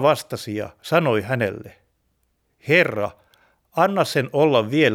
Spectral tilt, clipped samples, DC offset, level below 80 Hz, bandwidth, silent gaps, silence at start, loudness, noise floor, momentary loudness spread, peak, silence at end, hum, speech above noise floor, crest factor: -5.5 dB/octave; under 0.1%; under 0.1%; -62 dBFS; 17 kHz; none; 0 s; -21 LUFS; -69 dBFS; 12 LU; -2 dBFS; 0 s; none; 49 dB; 20 dB